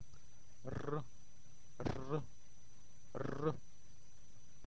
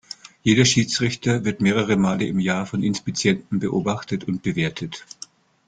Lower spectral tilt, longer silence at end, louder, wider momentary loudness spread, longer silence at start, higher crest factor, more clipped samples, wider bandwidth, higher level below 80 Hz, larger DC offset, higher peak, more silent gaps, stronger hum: first, -7 dB/octave vs -4.5 dB/octave; second, 0.2 s vs 0.65 s; second, -44 LUFS vs -21 LUFS; first, 23 LU vs 16 LU; second, 0 s vs 0.25 s; about the same, 22 dB vs 20 dB; neither; second, 8 kHz vs 9.4 kHz; second, -62 dBFS vs -54 dBFS; first, 0.7% vs under 0.1%; second, -24 dBFS vs -2 dBFS; neither; neither